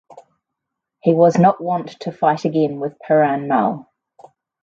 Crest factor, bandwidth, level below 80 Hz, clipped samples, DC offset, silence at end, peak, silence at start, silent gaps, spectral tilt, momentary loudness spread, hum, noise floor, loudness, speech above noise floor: 18 dB; 7.4 kHz; -66 dBFS; under 0.1%; under 0.1%; 0.8 s; 0 dBFS; 0.1 s; none; -8 dB/octave; 10 LU; none; -81 dBFS; -17 LUFS; 64 dB